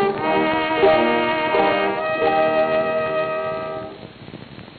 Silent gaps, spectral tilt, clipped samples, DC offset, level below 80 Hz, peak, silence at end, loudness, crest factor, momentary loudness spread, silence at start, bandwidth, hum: none; -9 dB/octave; under 0.1%; under 0.1%; -52 dBFS; -4 dBFS; 0 s; -19 LUFS; 16 dB; 21 LU; 0 s; 4.7 kHz; none